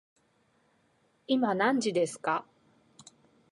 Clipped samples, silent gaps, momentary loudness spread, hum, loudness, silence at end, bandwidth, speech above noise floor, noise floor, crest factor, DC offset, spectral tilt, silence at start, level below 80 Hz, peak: under 0.1%; none; 6 LU; none; -29 LUFS; 1.1 s; 11.5 kHz; 42 dB; -70 dBFS; 20 dB; under 0.1%; -4.5 dB/octave; 1.3 s; -80 dBFS; -14 dBFS